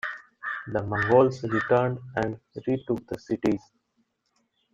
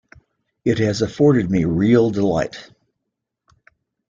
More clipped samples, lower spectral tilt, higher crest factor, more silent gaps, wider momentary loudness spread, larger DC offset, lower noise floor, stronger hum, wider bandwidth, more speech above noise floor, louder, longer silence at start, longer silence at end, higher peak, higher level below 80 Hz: neither; about the same, -7.5 dB/octave vs -7 dB/octave; about the same, 20 dB vs 16 dB; neither; first, 13 LU vs 10 LU; neither; second, -73 dBFS vs -79 dBFS; neither; about the same, 7.8 kHz vs 7.6 kHz; second, 48 dB vs 62 dB; second, -27 LUFS vs -18 LUFS; second, 0.05 s vs 0.65 s; second, 1.15 s vs 1.45 s; second, -6 dBFS vs -2 dBFS; second, -58 dBFS vs -48 dBFS